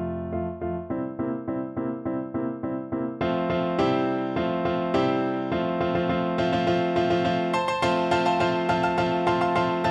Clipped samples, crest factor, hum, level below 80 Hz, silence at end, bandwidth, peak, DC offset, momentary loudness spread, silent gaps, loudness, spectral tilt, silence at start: under 0.1%; 16 dB; none; -52 dBFS; 0 s; 9.6 kHz; -8 dBFS; under 0.1%; 7 LU; none; -25 LUFS; -7 dB/octave; 0 s